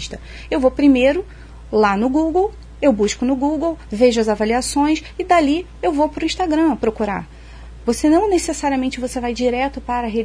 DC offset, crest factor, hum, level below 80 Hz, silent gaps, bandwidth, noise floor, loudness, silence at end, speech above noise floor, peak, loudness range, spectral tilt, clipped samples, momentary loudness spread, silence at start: under 0.1%; 16 dB; none; -38 dBFS; none; 11 kHz; -36 dBFS; -18 LUFS; 0 s; 19 dB; -2 dBFS; 2 LU; -4.5 dB/octave; under 0.1%; 9 LU; 0 s